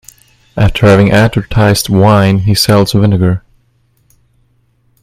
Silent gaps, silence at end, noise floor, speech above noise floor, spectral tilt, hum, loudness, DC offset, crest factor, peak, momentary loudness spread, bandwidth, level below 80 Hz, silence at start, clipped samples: none; 1.65 s; -54 dBFS; 46 dB; -6 dB/octave; none; -9 LUFS; under 0.1%; 10 dB; 0 dBFS; 7 LU; 16 kHz; -30 dBFS; 0.55 s; 0.3%